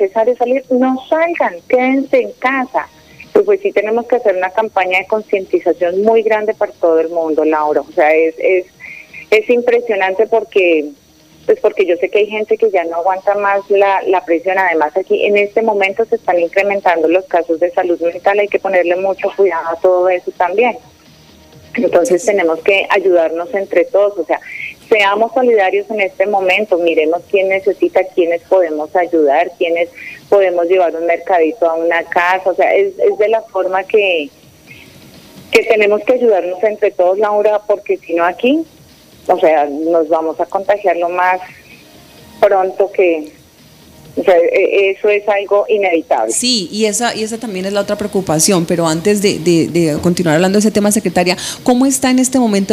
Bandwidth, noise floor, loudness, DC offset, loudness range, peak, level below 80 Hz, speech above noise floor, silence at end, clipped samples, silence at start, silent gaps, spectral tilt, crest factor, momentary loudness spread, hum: 15.5 kHz; -43 dBFS; -13 LUFS; under 0.1%; 2 LU; 0 dBFS; -54 dBFS; 30 dB; 0 s; under 0.1%; 0 s; none; -4 dB/octave; 14 dB; 6 LU; none